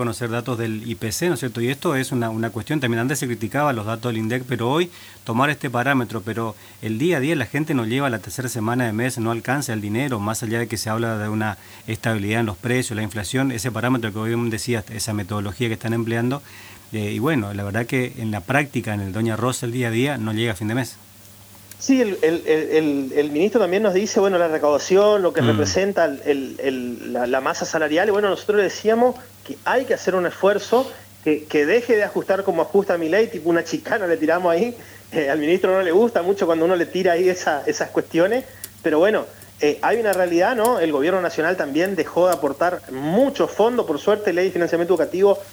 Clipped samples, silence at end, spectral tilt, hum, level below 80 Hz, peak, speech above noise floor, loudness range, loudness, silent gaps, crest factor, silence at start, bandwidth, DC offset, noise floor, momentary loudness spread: under 0.1%; 0 s; -5.5 dB/octave; none; -58 dBFS; -2 dBFS; 24 dB; 5 LU; -21 LUFS; none; 18 dB; 0 s; over 20 kHz; under 0.1%; -45 dBFS; 8 LU